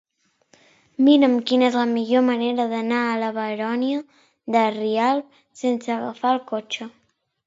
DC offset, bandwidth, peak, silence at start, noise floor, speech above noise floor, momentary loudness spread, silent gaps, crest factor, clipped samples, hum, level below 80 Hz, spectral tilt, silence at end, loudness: under 0.1%; 7.8 kHz; -4 dBFS; 1 s; -61 dBFS; 40 dB; 12 LU; none; 18 dB; under 0.1%; none; -74 dBFS; -5 dB/octave; 0.55 s; -21 LUFS